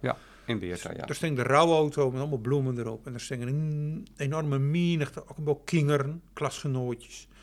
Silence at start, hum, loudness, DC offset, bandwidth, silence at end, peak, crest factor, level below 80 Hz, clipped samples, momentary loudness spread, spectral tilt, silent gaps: 0 s; none; -29 LUFS; under 0.1%; 13 kHz; 0.2 s; -6 dBFS; 22 dB; -58 dBFS; under 0.1%; 12 LU; -6.5 dB/octave; none